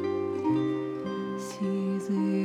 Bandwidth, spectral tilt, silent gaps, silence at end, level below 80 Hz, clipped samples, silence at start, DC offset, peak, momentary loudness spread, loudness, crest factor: 12.5 kHz; -7.5 dB/octave; none; 0 s; -70 dBFS; under 0.1%; 0 s; under 0.1%; -18 dBFS; 6 LU; -30 LUFS; 12 dB